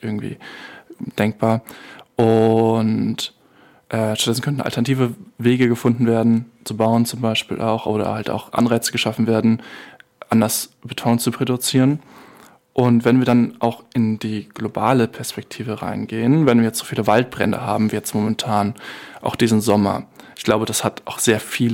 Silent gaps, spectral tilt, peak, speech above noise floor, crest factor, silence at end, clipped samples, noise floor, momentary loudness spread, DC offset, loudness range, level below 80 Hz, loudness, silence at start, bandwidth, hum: none; -5.5 dB/octave; -2 dBFS; 33 dB; 16 dB; 0 s; under 0.1%; -52 dBFS; 13 LU; under 0.1%; 2 LU; -58 dBFS; -19 LUFS; 0.05 s; 17 kHz; none